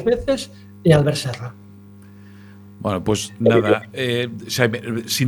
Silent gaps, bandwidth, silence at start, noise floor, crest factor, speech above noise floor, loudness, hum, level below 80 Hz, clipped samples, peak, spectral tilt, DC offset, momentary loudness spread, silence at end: none; 19 kHz; 0 s; -43 dBFS; 20 dB; 23 dB; -20 LUFS; none; -46 dBFS; under 0.1%; 0 dBFS; -5.5 dB/octave; under 0.1%; 13 LU; 0 s